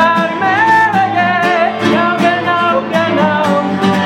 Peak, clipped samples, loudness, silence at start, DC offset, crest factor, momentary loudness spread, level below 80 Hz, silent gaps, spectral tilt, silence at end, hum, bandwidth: 0 dBFS; under 0.1%; -12 LUFS; 0 s; under 0.1%; 12 dB; 4 LU; -60 dBFS; none; -5.5 dB/octave; 0 s; none; 16 kHz